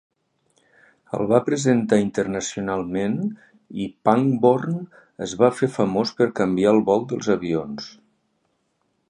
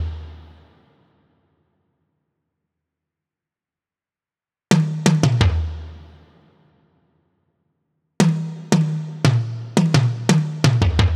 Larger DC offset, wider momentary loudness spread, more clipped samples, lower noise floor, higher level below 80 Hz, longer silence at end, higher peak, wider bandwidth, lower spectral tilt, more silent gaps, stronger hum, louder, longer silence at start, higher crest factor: neither; about the same, 13 LU vs 13 LU; neither; second, -70 dBFS vs under -90 dBFS; second, -58 dBFS vs -34 dBFS; first, 1.2 s vs 0 s; about the same, -2 dBFS vs -2 dBFS; second, 10.5 kHz vs 13 kHz; about the same, -6 dB/octave vs -6 dB/octave; neither; neither; about the same, -21 LUFS vs -19 LUFS; first, 1.1 s vs 0 s; about the same, 20 dB vs 20 dB